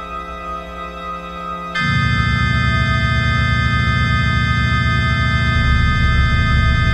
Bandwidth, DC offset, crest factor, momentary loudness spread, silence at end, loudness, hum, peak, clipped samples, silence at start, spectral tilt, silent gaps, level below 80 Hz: 9.2 kHz; under 0.1%; 14 dB; 12 LU; 0 s; -16 LUFS; none; -2 dBFS; under 0.1%; 0 s; -6 dB/octave; none; -22 dBFS